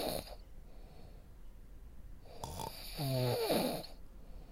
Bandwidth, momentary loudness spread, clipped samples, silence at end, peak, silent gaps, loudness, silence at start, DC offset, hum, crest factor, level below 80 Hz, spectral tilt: 16 kHz; 24 LU; under 0.1%; 0 s; -20 dBFS; none; -38 LUFS; 0 s; under 0.1%; none; 20 dB; -52 dBFS; -5 dB/octave